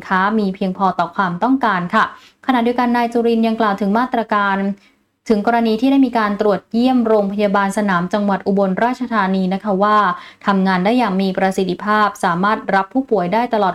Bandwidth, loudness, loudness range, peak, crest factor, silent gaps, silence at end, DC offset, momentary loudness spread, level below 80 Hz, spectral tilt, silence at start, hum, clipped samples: 13 kHz; -16 LUFS; 1 LU; -2 dBFS; 14 dB; none; 0 s; under 0.1%; 4 LU; -54 dBFS; -6.5 dB/octave; 0 s; none; under 0.1%